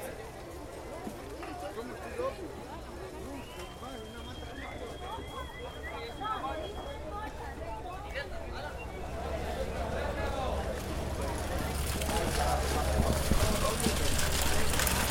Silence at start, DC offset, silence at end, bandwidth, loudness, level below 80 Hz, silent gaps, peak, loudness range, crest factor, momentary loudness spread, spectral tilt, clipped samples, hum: 0 s; under 0.1%; 0 s; 17 kHz; -35 LUFS; -38 dBFS; none; -12 dBFS; 11 LU; 22 dB; 13 LU; -4 dB/octave; under 0.1%; none